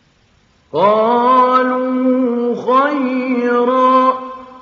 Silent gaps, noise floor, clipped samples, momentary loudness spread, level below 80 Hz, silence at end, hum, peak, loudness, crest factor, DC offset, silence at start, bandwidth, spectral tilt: none; -54 dBFS; under 0.1%; 7 LU; -66 dBFS; 0.05 s; none; -2 dBFS; -14 LUFS; 14 dB; under 0.1%; 0.75 s; 6.8 kHz; -3.5 dB/octave